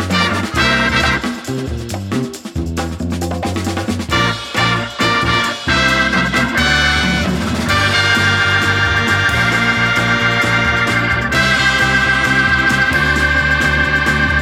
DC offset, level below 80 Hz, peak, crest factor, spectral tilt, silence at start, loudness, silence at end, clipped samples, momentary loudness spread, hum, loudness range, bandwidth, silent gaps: under 0.1%; -30 dBFS; -2 dBFS; 14 dB; -4 dB/octave; 0 s; -14 LUFS; 0 s; under 0.1%; 9 LU; none; 6 LU; 16.5 kHz; none